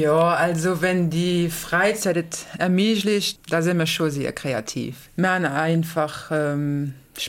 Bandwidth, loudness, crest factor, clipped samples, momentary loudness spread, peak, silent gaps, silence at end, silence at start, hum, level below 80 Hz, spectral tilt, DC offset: 17 kHz; -22 LUFS; 14 dB; under 0.1%; 7 LU; -8 dBFS; none; 0 s; 0 s; none; -54 dBFS; -5 dB/octave; under 0.1%